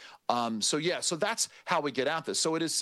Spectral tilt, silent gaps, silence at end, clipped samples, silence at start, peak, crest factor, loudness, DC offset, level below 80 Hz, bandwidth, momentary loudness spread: -2.5 dB/octave; none; 0 s; under 0.1%; 0 s; -10 dBFS; 20 dB; -29 LUFS; under 0.1%; -80 dBFS; 13.5 kHz; 3 LU